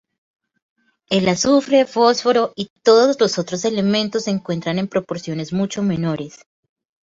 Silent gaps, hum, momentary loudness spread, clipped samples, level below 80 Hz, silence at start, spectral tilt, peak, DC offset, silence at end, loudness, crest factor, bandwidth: 2.70-2.76 s; none; 10 LU; under 0.1%; -58 dBFS; 1.1 s; -5 dB/octave; -2 dBFS; under 0.1%; 0.7 s; -18 LUFS; 18 dB; 8 kHz